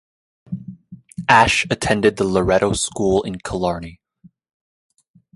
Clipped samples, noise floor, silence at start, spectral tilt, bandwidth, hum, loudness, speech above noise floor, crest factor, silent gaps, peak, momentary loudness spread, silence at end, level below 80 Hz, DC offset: under 0.1%; -52 dBFS; 0.5 s; -4 dB/octave; 11.5 kHz; none; -18 LUFS; 35 dB; 20 dB; none; 0 dBFS; 20 LU; 1.45 s; -42 dBFS; under 0.1%